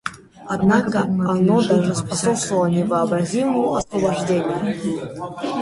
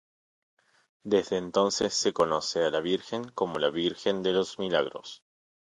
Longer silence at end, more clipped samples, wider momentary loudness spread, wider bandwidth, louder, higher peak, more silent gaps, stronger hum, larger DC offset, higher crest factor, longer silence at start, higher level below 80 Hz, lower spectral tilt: second, 0 s vs 0.65 s; neither; about the same, 9 LU vs 8 LU; about the same, 11.5 kHz vs 11 kHz; first, -20 LUFS vs -28 LUFS; first, -4 dBFS vs -10 dBFS; neither; neither; neither; second, 14 dB vs 20 dB; second, 0.05 s vs 1.05 s; first, -52 dBFS vs -66 dBFS; first, -6 dB/octave vs -3.5 dB/octave